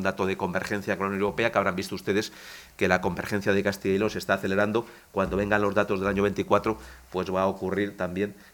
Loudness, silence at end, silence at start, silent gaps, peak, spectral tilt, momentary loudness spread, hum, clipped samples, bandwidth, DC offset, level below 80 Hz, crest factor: -27 LUFS; 0.2 s; 0 s; none; -4 dBFS; -5.5 dB/octave; 7 LU; none; under 0.1%; 19 kHz; under 0.1%; -52 dBFS; 22 dB